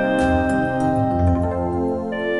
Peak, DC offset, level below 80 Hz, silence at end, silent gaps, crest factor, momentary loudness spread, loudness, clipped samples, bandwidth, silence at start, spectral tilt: -6 dBFS; 0.4%; -34 dBFS; 0 s; none; 14 dB; 5 LU; -20 LUFS; under 0.1%; 11.5 kHz; 0 s; -7.5 dB/octave